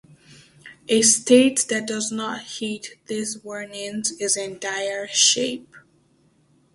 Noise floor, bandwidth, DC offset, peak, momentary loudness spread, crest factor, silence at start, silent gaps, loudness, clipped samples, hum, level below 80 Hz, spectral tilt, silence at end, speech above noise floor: -61 dBFS; 11.5 kHz; under 0.1%; -2 dBFS; 16 LU; 22 dB; 0.3 s; none; -21 LUFS; under 0.1%; none; -68 dBFS; -1.5 dB/octave; 0.95 s; 39 dB